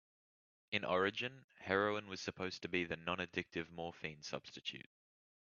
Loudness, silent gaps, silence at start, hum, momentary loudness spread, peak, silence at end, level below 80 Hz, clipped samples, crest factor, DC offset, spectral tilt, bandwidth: -41 LUFS; 1.44-1.49 s; 0.7 s; none; 11 LU; -18 dBFS; 0.75 s; -76 dBFS; under 0.1%; 24 dB; under 0.1%; -2.5 dB/octave; 7 kHz